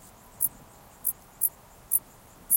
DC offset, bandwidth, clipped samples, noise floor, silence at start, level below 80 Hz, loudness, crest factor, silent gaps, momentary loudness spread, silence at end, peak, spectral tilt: under 0.1%; 17.5 kHz; under 0.1%; -52 dBFS; 0.4 s; -60 dBFS; -29 LUFS; 24 dB; none; 4 LU; 0 s; -8 dBFS; -1 dB/octave